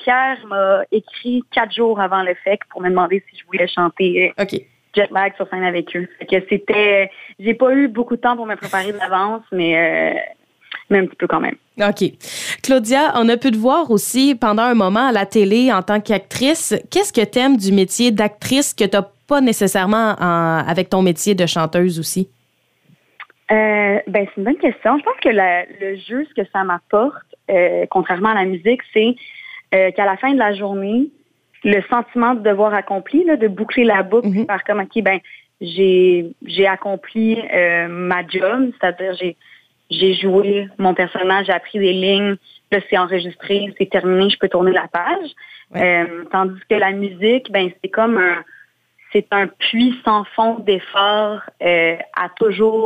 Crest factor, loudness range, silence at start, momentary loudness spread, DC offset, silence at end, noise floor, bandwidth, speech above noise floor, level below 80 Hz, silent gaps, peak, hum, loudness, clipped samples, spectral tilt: 14 dB; 3 LU; 0 s; 8 LU; under 0.1%; 0 s; -62 dBFS; 15.5 kHz; 45 dB; -58 dBFS; none; -2 dBFS; none; -17 LUFS; under 0.1%; -4.5 dB/octave